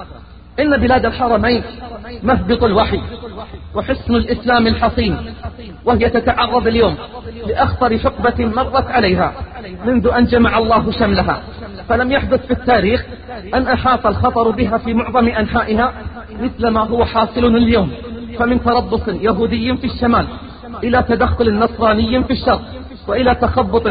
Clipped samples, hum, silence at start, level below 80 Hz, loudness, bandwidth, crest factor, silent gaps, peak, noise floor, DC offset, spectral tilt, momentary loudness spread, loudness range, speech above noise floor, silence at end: under 0.1%; none; 0 s; -30 dBFS; -15 LUFS; 5 kHz; 14 dB; none; -2 dBFS; -36 dBFS; 0.2%; -11 dB/octave; 15 LU; 2 LU; 21 dB; 0 s